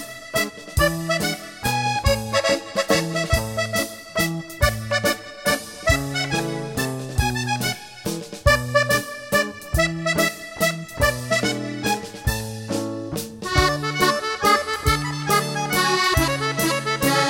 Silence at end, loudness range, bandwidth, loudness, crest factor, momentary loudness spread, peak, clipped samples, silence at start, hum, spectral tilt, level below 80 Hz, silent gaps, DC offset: 0 s; 3 LU; 17 kHz; -22 LUFS; 20 dB; 7 LU; -4 dBFS; under 0.1%; 0 s; none; -4 dB/octave; -34 dBFS; none; under 0.1%